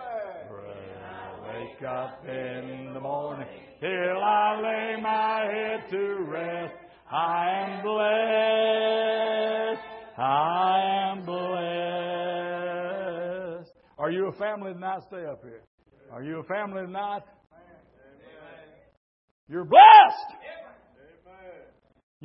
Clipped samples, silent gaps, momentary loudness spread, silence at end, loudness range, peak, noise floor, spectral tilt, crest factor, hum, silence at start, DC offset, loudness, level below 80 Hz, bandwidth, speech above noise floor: under 0.1%; 15.67-15.78 s, 18.97-19.47 s; 17 LU; 0.65 s; 18 LU; -2 dBFS; -56 dBFS; -8.5 dB/octave; 24 dB; none; 0 s; under 0.1%; -23 LUFS; -72 dBFS; 5.8 kHz; 34 dB